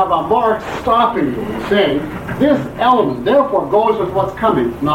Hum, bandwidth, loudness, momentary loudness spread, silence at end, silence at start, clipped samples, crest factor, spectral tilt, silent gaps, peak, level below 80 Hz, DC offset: none; 16.5 kHz; -15 LUFS; 6 LU; 0 s; 0 s; under 0.1%; 12 dB; -7 dB/octave; none; -2 dBFS; -40 dBFS; under 0.1%